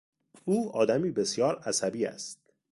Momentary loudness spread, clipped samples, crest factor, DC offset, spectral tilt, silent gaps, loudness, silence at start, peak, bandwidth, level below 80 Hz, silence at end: 13 LU; under 0.1%; 20 dB; under 0.1%; -4 dB/octave; none; -29 LUFS; 0.45 s; -10 dBFS; 11.5 kHz; -70 dBFS; 0.4 s